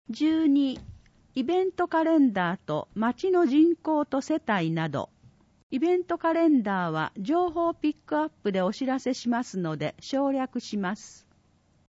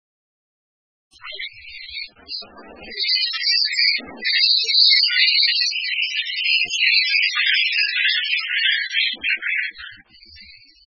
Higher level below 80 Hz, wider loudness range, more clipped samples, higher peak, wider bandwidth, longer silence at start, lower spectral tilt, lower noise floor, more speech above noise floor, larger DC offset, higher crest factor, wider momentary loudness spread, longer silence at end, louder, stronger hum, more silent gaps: about the same, -64 dBFS vs -62 dBFS; second, 4 LU vs 7 LU; neither; second, -12 dBFS vs -2 dBFS; about the same, 8 kHz vs 8 kHz; second, 0.1 s vs 1.25 s; first, -6.5 dB/octave vs 2 dB/octave; first, -64 dBFS vs -46 dBFS; first, 38 dB vs 25 dB; neither; about the same, 14 dB vs 18 dB; second, 9 LU vs 18 LU; first, 0.85 s vs 0.35 s; second, -26 LUFS vs -16 LUFS; neither; first, 5.63-5.70 s vs none